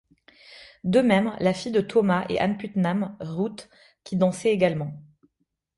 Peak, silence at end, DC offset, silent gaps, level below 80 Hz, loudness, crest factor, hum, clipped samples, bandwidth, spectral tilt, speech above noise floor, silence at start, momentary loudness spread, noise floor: -8 dBFS; 0.75 s; under 0.1%; none; -60 dBFS; -24 LUFS; 18 dB; none; under 0.1%; 11.5 kHz; -6.5 dB/octave; 53 dB; 0.5 s; 10 LU; -76 dBFS